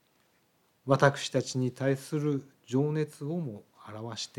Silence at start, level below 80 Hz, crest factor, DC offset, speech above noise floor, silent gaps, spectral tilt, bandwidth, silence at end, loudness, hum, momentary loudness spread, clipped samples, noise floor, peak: 0.85 s; -78 dBFS; 22 dB; under 0.1%; 40 dB; none; -6 dB/octave; 14 kHz; 0.1 s; -30 LUFS; none; 17 LU; under 0.1%; -70 dBFS; -8 dBFS